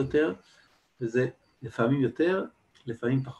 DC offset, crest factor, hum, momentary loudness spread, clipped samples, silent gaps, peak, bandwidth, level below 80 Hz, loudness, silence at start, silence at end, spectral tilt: under 0.1%; 16 dB; none; 16 LU; under 0.1%; none; -12 dBFS; 8.8 kHz; -62 dBFS; -29 LUFS; 0 s; 0.05 s; -8 dB/octave